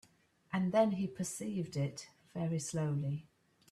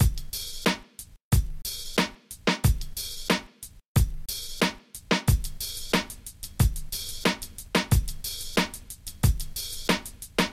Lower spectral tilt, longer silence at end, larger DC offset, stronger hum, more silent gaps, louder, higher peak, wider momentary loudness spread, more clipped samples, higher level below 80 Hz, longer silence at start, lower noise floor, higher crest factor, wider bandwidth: first, -6 dB/octave vs -4 dB/octave; first, 0.5 s vs 0 s; neither; neither; second, none vs 1.24-1.31 s, 3.88-3.95 s; second, -36 LUFS vs -28 LUFS; second, -18 dBFS vs -8 dBFS; about the same, 10 LU vs 10 LU; neither; second, -72 dBFS vs -32 dBFS; first, 0.5 s vs 0 s; first, -67 dBFS vs -47 dBFS; about the same, 18 dB vs 20 dB; second, 13.5 kHz vs 16.5 kHz